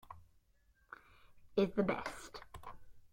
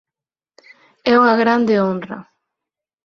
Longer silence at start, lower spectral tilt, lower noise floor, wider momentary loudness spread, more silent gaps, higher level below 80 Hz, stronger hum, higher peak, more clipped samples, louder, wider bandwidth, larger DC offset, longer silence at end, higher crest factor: second, 0.1 s vs 1.05 s; about the same, -6 dB/octave vs -7 dB/octave; second, -72 dBFS vs -88 dBFS; first, 23 LU vs 17 LU; neither; about the same, -64 dBFS vs -62 dBFS; neither; second, -22 dBFS vs -2 dBFS; neither; second, -38 LUFS vs -16 LUFS; first, 16.5 kHz vs 6.6 kHz; neither; second, 0.05 s vs 0.85 s; about the same, 20 dB vs 16 dB